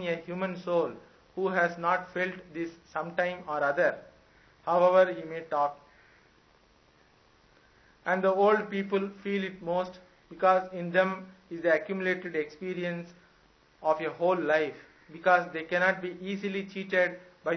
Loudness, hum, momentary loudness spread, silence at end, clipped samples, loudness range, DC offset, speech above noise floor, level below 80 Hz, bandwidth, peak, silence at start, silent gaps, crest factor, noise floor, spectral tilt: -29 LUFS; none; 12 LU; 0 s; under 0.1%; 3 LU; under 0.1%; 34 dB; -70 dBFS; 6.4 kHz; -8 dBFS; 0 s; none; 22 dB; -63 dBFS; -6.5 dB/octave